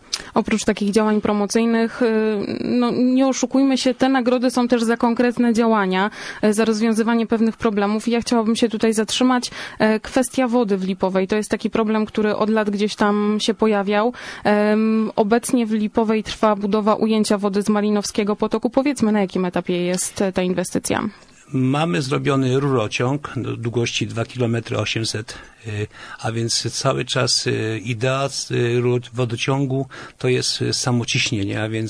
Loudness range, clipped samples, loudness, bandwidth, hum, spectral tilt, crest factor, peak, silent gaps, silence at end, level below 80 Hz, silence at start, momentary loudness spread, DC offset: 3 LU; under 0.1%; -20 LUFS; 11 kHz; none; -5 dB/octave; 16 dB; -4 dBFS; none; 0 s; -52 dBFS; 0.1 s; 6 LU; under 0.1%